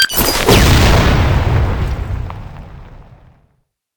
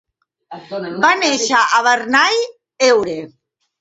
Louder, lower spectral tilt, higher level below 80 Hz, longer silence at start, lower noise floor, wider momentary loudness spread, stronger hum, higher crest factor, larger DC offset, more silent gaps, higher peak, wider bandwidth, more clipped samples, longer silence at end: about the same, -12 LUFS vs -14 LUFS; first, -4.5 dB/octave vs -1.5 dB/octave; first, -18 dBFS vs -62 dBFS; second, 0 s vs 0.5 s; first, -62 dBFS vs -40 dBFS; first, 20 LU vs 14 LU; neither; about the same, 14 dB vs 16 dB; neither; neither; about the same, 0 dBFS vs 0 dBFS; first, 19.5 kHz vs 8 kHz; neither; first, 0.95 s vs 0.55 s